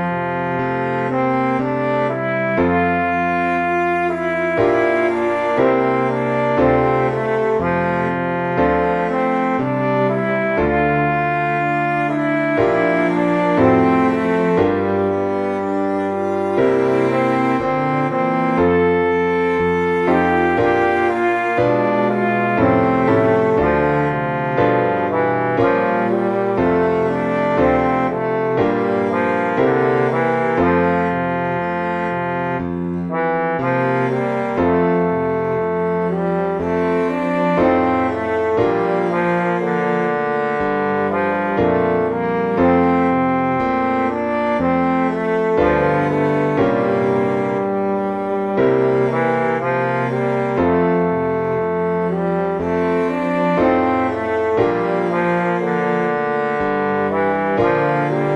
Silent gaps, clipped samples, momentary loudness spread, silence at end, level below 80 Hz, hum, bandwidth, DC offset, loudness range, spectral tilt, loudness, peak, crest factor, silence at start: none; under 0.1%; 4 LU; 0 s; -44 dBFS; none; 9.2 kHz; under 0.1%; 2 LU; -8.5 dB/octave; -17 LUFS; -2 dBFS; 16 dB; 0 s